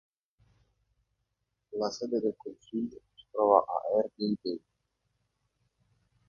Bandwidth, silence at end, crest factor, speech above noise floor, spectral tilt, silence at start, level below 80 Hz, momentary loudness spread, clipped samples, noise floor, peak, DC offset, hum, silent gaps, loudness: 7.2 kHz; 1.7 s; 26 dB; 53 dB; -6.5 dB/octave; 1.7 s; -74 dBFS; 16 LU; under 0.1%; -82 dBFS; -8 dBFS; under 0.1%; none; none; -31 LUFS